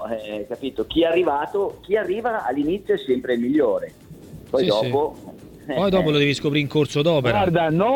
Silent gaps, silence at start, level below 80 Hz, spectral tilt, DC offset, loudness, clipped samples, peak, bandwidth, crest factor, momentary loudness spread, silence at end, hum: none; 0 s; -50 dBFS; -6.5 dB/octave; under 0.1%; -21 LUFS; under 0.1%; -6 dBFS; 17.5 kHz; 16 dB; 10 LU; 0 s; none